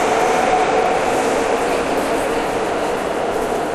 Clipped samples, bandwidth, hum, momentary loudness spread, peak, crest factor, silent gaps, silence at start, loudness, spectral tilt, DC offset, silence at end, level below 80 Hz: under 0.1%; 15 kHz; none; 5 LU; -4 dBFS; 14 dB; none; 0 s; -18 LUFS; -3.5 dB/octave; under 0.1%; 0 s; -42 dBFS